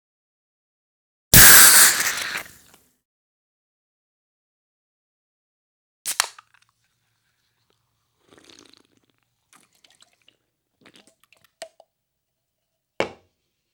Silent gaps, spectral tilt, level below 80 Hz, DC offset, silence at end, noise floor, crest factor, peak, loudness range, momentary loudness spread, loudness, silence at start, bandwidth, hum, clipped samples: 3.05-6.05 s; -0.5 dB/octave; -44 dBFS; under 0.1%; 0.65 s; -79 dBFS; 22 dB; 0 dBFS; 25 LU; 24 LU; -11 LUFS; 1.35 s; over 20 kHz; none; under 0.1%